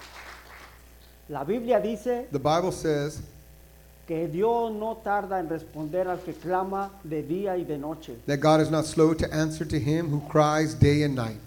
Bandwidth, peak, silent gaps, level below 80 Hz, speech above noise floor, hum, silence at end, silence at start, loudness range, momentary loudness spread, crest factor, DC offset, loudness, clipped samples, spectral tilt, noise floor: 18 kHz; -6 dBFS; none; -50 dBFS; 26 dB; none; 0 s; 0 s; 6 LU; 14 LU; 22 dB; under 0.1%; -26 LUFS; under 0.1%; -6.5 dB/octave; -51 dBFS